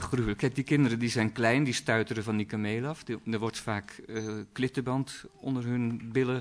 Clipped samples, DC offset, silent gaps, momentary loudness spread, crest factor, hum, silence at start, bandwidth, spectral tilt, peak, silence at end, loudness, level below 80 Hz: under 0.1%; under 0.1%; none; 10 LU; 18 dB; none; 0 s; 11 kHz; -6 dB/octave; -12 dBFS; 0 s; -30 LUFS; -54 dBFS